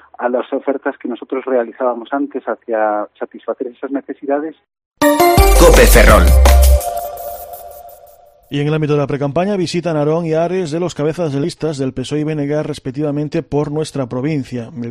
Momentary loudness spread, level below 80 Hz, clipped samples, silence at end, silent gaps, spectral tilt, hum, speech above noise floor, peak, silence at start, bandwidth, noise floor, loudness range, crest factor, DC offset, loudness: 16 LU; -18 dBFS; 0.1%; 0 s; 4.86-4.91 s; -5.5 dB/octave; none; 28 dB; 0 dBFS; 0.2 s; 16 kHz; -44 dBFS; 9 LU; 14 dB; under 0.1%; -15 LUFS